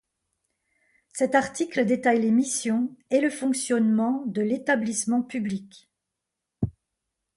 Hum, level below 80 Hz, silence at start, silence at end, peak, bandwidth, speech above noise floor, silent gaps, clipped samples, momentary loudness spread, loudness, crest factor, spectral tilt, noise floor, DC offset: none; -56 dBFS; 1.15 s; 0.65 s; -8 dBFS; 11.5 kHz; 60 dB; none; under 0.1%; 11 LU; -25 LUFS; 18 dB; -4.5 dB/octave; -84 dBFS; under 0.1%